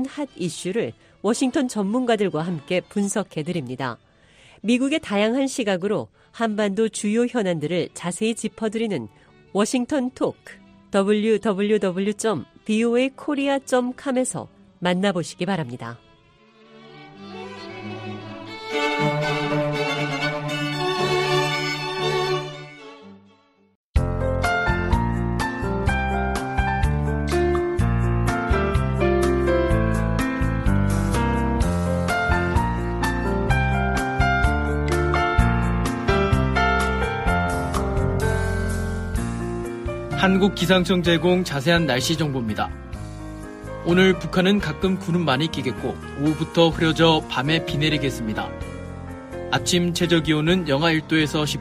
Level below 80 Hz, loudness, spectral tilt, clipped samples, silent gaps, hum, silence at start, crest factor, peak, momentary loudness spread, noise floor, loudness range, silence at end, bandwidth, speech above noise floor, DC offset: -32 dBFS; -22 LUFS; -5.5 dB/octave; under 0.1%; 23.75-23.94 s; none; 0 s; 18 dB; -4 dBFS; 11 LU; -57 dBFS; 4 LU; 0 s; 15 kHz; 35 dB; under 0.1%